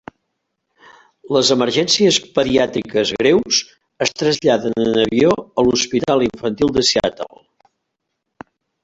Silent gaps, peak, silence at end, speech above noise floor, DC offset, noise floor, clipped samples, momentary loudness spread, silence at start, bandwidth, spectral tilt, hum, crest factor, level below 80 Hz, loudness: none; -2 dBFS; 1.55 s; 59 dB; under 0.1%; -76 dBFS; under 0.1%; 7 LU; 1.25 s; 8.2 kHz; -3.5 dB/octave; none; 16 dB; -48 dBFS; -16 LUFS